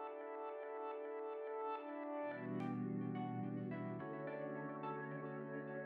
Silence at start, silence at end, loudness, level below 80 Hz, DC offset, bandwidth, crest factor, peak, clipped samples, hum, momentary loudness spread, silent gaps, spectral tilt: 0 s; 0 s; -46 LUFS; under -90 dBFS; under 0.1%; 5.2 kHz; 12 dB; -32 dBFS; under 0.1%; none; 4 LU; none; -7.5 dB/octave